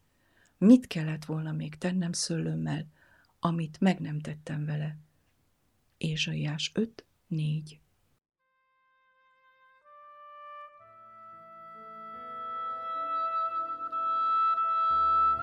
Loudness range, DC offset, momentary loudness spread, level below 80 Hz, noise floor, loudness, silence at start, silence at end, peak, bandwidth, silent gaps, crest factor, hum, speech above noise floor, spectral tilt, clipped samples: 22 LU; under 0.1%; 24 LU; -66 dBFS; -74 dBFS; -29 LUFS; 0.6 s; 0 s; -8 dBFS; 12 kHz; none; 22 dB; none; 45 dB; -5.5 dB/octave; under 0.1%